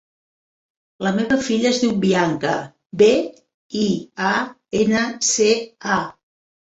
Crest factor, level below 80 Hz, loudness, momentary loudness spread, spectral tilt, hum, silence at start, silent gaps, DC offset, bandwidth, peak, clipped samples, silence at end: 18 dB; -58 dBFS; -19 LUFS; 10 LU; -4 dB/octave; none; 1 s; 3.54-3.70 s; under 0.1%; 8.2 kHz; -2 dBFS; under 0.1%; 0.55 s